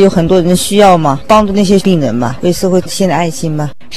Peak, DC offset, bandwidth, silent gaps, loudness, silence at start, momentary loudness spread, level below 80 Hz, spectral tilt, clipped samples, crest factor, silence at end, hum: 0 dBFS; 6%; 14 kHz; none; -10 LUFS; 0 s; 8 LU; -34 dBFS; -5.5 dB/octave; 1%; 10 dB; 0 s; none